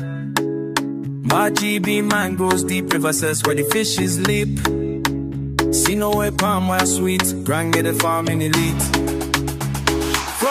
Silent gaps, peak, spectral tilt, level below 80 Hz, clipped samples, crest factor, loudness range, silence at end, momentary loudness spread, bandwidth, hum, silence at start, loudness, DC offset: none; 0 dBFS; -4 dB/octave; -36 dBFS; under 0.1%; 18 dB; 1 LU; 0 s; 5 LU; 15.5 kHz; none; 0 s; -19 LUFS; under 0.1%